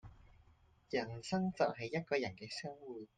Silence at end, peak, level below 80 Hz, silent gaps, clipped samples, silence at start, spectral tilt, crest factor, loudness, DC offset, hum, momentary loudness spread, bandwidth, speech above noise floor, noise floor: 0.1 s; -20 dBFS; -68 dBFS; none; under 0.1%; 0.05 s; -5.5 dB/octave; 22 dB; -40 LUFS; under 0.1%; none; 9 LU; 9.4 kHz; 29 dB; -68 dBFS